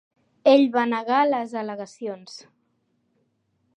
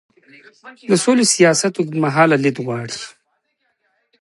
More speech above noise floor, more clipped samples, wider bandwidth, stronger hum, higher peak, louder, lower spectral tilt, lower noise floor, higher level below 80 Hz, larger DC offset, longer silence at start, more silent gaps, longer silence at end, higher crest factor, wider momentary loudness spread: about the same, 49 dB vs 52 dB; neither; second, 9.2 kHz vs 11.5 kHz; neither; second, -4 dBFS vs 0 dBFS; second, -21 LUFS vs -16 LUFS; about the same, -5 dB/octave vs -4 dB/octave; about the same, -70 dBFS vs -68 dBFS; second, -82 dBFS vs -66 dBFS; neither; second, 0.45 s vs 0.65 s; neither; first, 1.4 s vs 1.1 s; about the same, 20 dB vs 18 dB; first, 20 LU vs 16 LU